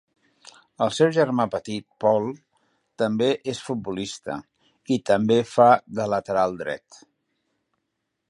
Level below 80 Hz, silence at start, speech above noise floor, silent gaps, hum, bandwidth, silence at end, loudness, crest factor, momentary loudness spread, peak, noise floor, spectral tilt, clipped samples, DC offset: -64 dBFS; 0.8 s; 56 dB; none; none; 11.5 kHz; 1.55 s; -23 LUFS; 22 dB; 15 LU; -2 dBFS; -79 dBFS; -5.5 dB/octave; under 0.1%; under 0.1%